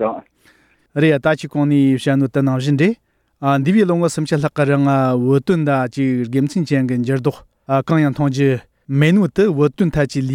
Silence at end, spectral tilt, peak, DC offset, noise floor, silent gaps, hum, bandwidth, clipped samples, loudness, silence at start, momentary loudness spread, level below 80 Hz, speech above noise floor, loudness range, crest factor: 0 s; -7.5 dB/octave; -2 dBFS; under 0.1%; -54 dBFS; none; none; 11.5 kHz; under 0.1%; -17 LUFS; 0 s; 6 LU; -48 dBFS; 38 dB; 1 LU; 14 dB